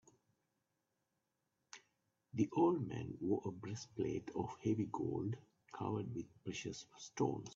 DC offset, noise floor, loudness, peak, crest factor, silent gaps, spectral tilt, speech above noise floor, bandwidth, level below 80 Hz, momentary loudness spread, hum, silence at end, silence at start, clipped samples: under 0.1%; -87 dBFS; -41 LUFS; -22 dBFS; 20 dB; none; -7 dB/octave; 47 dB; 7.6 kHz; -74 dBFS; 16 LU; none; 0 s; 1.75 s; under 0.1%